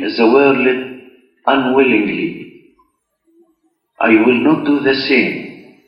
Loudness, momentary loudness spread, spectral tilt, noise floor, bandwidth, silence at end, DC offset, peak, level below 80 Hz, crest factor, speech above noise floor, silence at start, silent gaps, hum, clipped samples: -13 LUFS; 13 LU; -7.5 dB/octave; -62 dBFS; 5.8 kHz; 0.3 s; under 0.1%; 0 dBFS; -58 dBFS; 16 dB; 49 dB; 0 s; none; none; under 0.1%